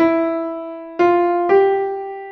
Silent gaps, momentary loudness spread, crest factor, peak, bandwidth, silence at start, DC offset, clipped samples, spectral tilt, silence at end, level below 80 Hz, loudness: none; 13 LU; 14 dB; -2 dBFS; 6.2 kHz; 0 s; under 0.1%; under 0.1%; -7 dB/octave; 0 s; -58 dBFS; -17 LUFS